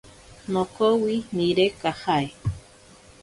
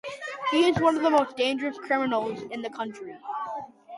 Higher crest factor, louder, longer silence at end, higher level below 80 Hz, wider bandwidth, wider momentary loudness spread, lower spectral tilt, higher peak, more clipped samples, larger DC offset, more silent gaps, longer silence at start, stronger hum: about the same, 16 dB vs 18 dB; about the same, -24 LUFS vs -26 LUFS; first, 0.6 s vs 0 s; first, -48 dBFS vs -62 dBFS; about the same, 11.5 kHz vs 11.5 kHz; second, 11 LU vs 14 LU; about the same, -6 dB/octave vs -5 dB/octave; about the same, -8 dBFS vs -10 dBFS; neither; neither; neither; first, 0.45 s vs 0.05 s; neither